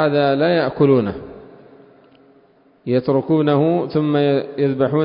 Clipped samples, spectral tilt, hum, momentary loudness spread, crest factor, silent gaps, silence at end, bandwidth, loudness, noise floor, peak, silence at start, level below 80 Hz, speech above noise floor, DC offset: under 0.1%; -12.5 dB/octave; none; 9 LU; 14 dB; none; 0 s; 5.4 kHz; -17 LUFS; -53 dBFS; -4 dBFS; 0 s; -54 dBFS; 37 dB; under 0.1%